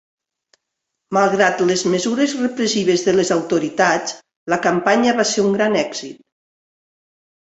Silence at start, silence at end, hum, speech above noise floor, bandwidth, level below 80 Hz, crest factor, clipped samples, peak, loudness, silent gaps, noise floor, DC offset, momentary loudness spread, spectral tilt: 1.1 s; 1.35 s; none; 62 dB; 8.2 kHz; -62 dBFS; 18 dB; under 0.1%; -2 dBFS; -17 LUFS; 4.36-4.46 s; -79 dBFS; under 0.1%; 7 LU; -4 dB/octave